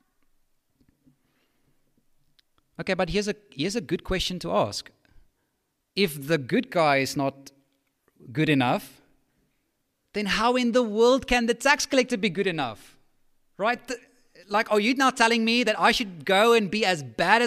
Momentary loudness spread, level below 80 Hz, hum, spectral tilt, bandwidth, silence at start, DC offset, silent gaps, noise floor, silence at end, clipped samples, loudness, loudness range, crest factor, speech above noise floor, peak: 10 LU; -50 dBFS; none; -4 dB/octave; 15.5 kHz; 2.8 s; under 0.1%; none; -76 dBFS; 0 s; under 0.1%; -24 LUFS; 8 LU; 24 dB; 52 dB; -2 dBFS